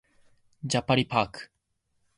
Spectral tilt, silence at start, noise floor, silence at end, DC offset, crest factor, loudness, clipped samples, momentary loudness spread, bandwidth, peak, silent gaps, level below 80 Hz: -4.5 dB/octave; 0.65 s; -76 dBFS; 0.7 s; under 0.1%; 22 dB; -27 LUFS; under 0.1%; 16 LU; 11.5 kHz; -10 dBFS; none; -58 dBFS